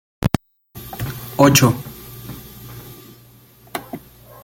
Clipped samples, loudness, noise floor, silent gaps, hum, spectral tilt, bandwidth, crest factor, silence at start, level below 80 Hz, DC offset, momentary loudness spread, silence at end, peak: under 0.1%; -18 LUFS; -48 dBFS; none; none; -4.5 dB/octave; 17 kHz; 22 dB; 0.2 s; -42 dBFS; under 0.1%; 24 LU; 0.45 s; 0 dBFS